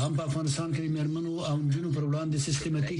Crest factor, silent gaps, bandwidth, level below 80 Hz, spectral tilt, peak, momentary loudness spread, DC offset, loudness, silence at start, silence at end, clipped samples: 12 dB; none; 11 kHz; -58 dBFS; -6 dB/octave; -16 dBFS; 2 LU; under 0.1%; -30 LUFS; 0 s; 0 s; under 0.1%